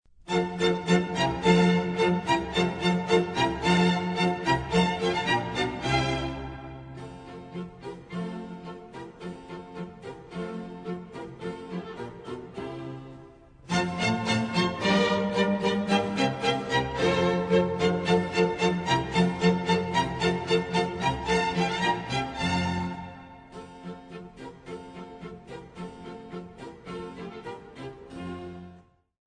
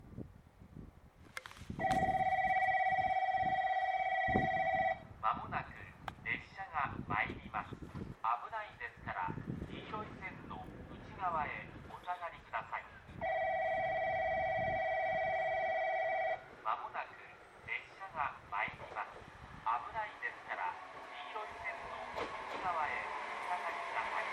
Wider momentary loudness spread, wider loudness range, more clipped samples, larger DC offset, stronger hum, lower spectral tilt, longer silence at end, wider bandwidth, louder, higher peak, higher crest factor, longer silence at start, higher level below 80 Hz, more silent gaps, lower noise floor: first, 18 LU vs 15 LU; first, 16 LU vs 9 LU; neither; neither; neither; about the same, -5.5 dB/octave vs -5.5 dB/octave; first, 0.45 s vs 0 s; second, 10 kHz vs 11.5 kHz; first, -26 LUFS vs -38 LUFS; first, -8 dBFS vs -18 dBFS; about the same, 20 dB vs 22 dB; first, 0.2 s vs 0 s; first, -50 dBFS vs -60 dBFS; neither; second, -54 dBFS vs -59 dBFS